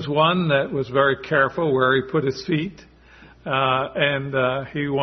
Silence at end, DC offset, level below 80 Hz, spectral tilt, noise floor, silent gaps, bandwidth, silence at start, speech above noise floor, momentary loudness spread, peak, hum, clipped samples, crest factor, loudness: 0 s; under 0.1%; -54 dBFS; -7 dB/octave; -48 dBFS; none; 6.4 kHz; 0 s; 27 dB; 7 LU; -4 dBFS; none; under 0.1%; 18 dB; -21 LUFS